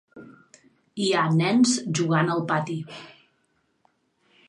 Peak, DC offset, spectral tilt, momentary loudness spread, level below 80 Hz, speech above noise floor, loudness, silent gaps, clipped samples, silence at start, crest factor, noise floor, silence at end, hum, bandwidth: -8 dBFS; under 0.1%; -5 dB/octave; 18 LU; -72 dBFS; 47 dB; -23 LUFS; none; under 0.1%; 0.15 s; 18 dB; -70 dBFS; 1.4 s; none; 11 kHz